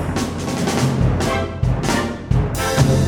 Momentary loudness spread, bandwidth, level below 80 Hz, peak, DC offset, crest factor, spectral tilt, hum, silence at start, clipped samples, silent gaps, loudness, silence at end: 5 LU; 18.5 kHz; -28 dBFS; -2 dBFS; under 0.1%; 16 dB; -5.5 dB/octave; none; 0 s; under 0.1%; none; -19 LUFS; 0 s